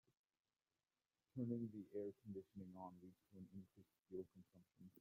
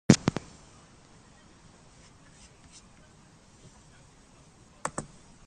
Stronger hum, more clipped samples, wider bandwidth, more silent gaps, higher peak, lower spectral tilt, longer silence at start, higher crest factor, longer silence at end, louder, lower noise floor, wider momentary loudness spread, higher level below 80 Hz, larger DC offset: neither; neither; first, 15.5 kHz vs 10.5 kHz; neither; second, -34 dBFS vs -2 dBFS; first, -10.5 dB/octave vs -5 dB/octave; first, 1.35 s vs 0.1 s; second, 22 dB vs 32 dB; second, 0 s vs 0.45 s; second, -54 LUFS vs -29 LUFS; first, under -90 dBFS vs -56 dBFS; second, 18 LU vs 21 LU; second, -90 dBFS vs -58 dBFS; neither